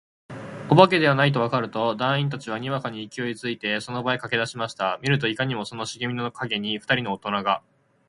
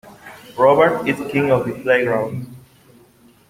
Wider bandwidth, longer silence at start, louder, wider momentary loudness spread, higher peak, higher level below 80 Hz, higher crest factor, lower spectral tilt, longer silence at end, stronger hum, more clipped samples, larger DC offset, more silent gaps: second, 11.5 kHz vs 16 kHz; first, 0.3 s vs 0.05 s; second, -24 LUFS vs -17 LUFS; second, 12 LU vs 17 LU; about the same, 0 dBFS vs 0 dBFS; second, -64 dBFS vs -56 dBFS; first, 24 dB vs 18 dB; second, -5.5 dB/octave vs -7 dB/octave; second, 0.5 s vs 0.9 s; neither; neither; neither; neither